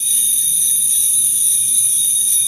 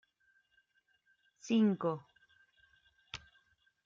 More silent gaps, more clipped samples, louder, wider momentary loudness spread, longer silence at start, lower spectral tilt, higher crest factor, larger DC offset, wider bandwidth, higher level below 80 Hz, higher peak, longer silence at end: neither; neither; first, -11 LUFS vs -33 LUFS; second, 1 LU vs 19 LU; second, 0 s vs 1.45 s; second, 3 dB/octave vs -6.5 dB/octave; second, 12 dB vs 18 dB; neither; first, 16 kHz vs 7.4 kHz; about the same, -70 dBFS vs -74 dBFS; first, -2 dBFS vs -20 dBFS; second, 0 s vs 0.7 s